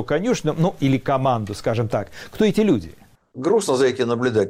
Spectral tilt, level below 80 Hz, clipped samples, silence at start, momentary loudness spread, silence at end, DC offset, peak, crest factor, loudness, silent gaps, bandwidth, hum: -6 dB/octave; -48 dBFS; under 0.1%; 0 s; 6 LU; 0 s; under 0.1%; -8 dBFS; 12 dB; -21 LUFS; none; 16 kHz; none